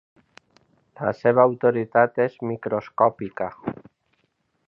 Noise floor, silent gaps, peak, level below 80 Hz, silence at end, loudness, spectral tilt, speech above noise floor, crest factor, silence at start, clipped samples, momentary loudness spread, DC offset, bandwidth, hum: -70 dBFS; none; -2 dBFS; -64 dBFS; 0.95 s; -22 LUFS; -9.5 dB/octave; 49 dB; 22 dB; 1 s; under 0.1%; 12 LU; under 0.1%; 5.8 kHz; none